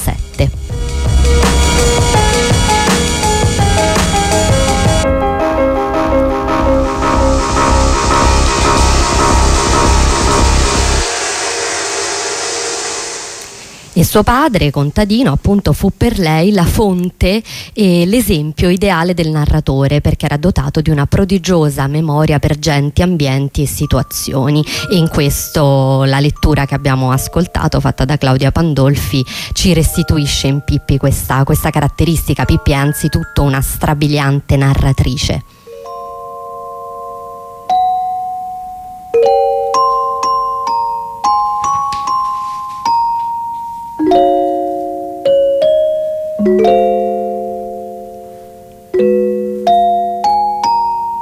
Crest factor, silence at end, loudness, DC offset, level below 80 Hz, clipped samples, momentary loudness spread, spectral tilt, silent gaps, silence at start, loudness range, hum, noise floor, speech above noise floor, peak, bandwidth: 12 dB; 0 s; -13 LUFS; under 0.1%; -20 dBFS; under 0.1%; 10 LU; -5 dB/octave; none; 0 s; 4 LU; none; -35 dBFS; 24 dB; 0 dBFS; 16 kHz